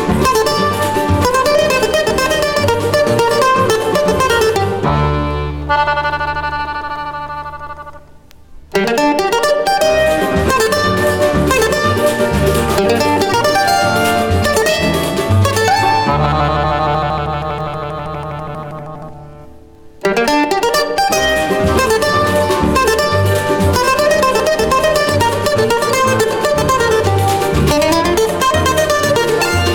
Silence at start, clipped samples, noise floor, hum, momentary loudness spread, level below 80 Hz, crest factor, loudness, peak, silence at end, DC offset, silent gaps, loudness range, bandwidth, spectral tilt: 0 s; under 0.1%; -39 dBFS; none; 9 LU; -30 dBFS; 14 dB; -13 LUFS; 0 dBFS; 0 s; under 0.1%; none; 6 LU; 19 kHz; -4.5 dB/octave